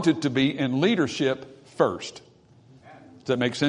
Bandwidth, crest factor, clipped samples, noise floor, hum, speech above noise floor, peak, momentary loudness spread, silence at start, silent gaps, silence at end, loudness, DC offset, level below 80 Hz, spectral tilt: 10.5 kHz; 20 dB; under 0.1%; -54 dBFS; none; 30 dB; -6 dBFS; 15 LU; 0 s; none; 0 s; -25 LUFS; under 0.1%; -66 dBFS; -5.5 dB/octave